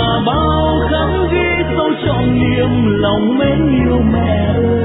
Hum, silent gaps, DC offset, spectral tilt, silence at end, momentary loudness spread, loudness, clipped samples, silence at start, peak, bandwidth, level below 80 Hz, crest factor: none; none; under 0.1%; -11 dB/octave; 0 s; 2 LU; -14 LUFS; under 0.1%; 0 s; -2 dBFS; 4 kHz; -24 dBFS; 12 dB